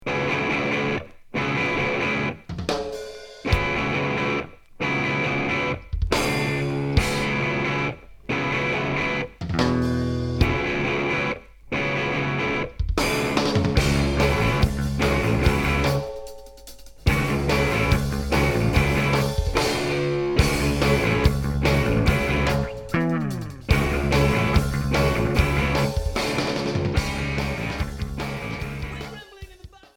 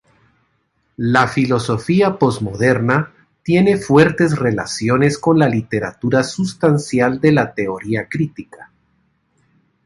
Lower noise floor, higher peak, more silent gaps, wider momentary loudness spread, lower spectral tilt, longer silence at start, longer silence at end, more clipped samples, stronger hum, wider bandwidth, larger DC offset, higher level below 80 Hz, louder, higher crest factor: second, -46 dBFS vs -65 dBFS; second, -4 dBFS vs 0 dBFS; neither; about the same, 9 LU vs 9 LU; about the same, -5.5 dB/octave vs -6.5 dB/octave; second, 0 s vs 1 s; second, 0.3 s vs 1.2 s; neither; neither; first, 18.5 kHz vs 11.5 kHz; neither; first, -32 dBFS vs -50 dBFS; second, -23 LUFS vs -16 LUFS; about the same, 18 dB vs 16 dB